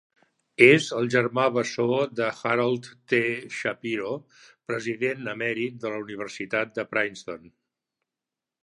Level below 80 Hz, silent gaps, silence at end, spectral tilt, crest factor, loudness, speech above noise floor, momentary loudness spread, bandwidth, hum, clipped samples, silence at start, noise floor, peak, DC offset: -72 dBFS; none; 1.25 s; -5 dB/octave; 26 dB; -25 LUFS; 63 dB; 14 LU; 11 kHz; none; under 0.1%; 0.6 s; -89 dBFS; -2 dBFS; under 0.1%